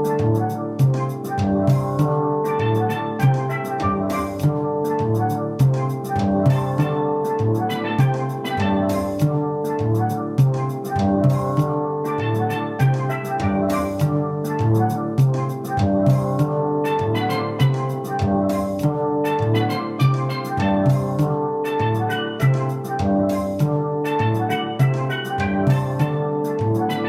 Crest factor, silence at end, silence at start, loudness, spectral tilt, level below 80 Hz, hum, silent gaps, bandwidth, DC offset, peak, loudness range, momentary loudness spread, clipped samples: 16 dB; 0 s; 0 s; -21 LUFS; -8 dB/octave; -50 dBFS; none; none; 15 kHz; under 0.1%; -4 dBFS; 1 LU; 4 LU; under 0.1%